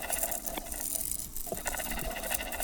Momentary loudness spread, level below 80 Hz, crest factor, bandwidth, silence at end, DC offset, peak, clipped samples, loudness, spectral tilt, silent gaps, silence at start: 5 LU; -46 dBFS; 24 dB; 19.5 kHz; 0 s; under 0.1%; -12 dBFS; under 0.1%; -33 LUFS; -1.5 dB/octave; none; 0 s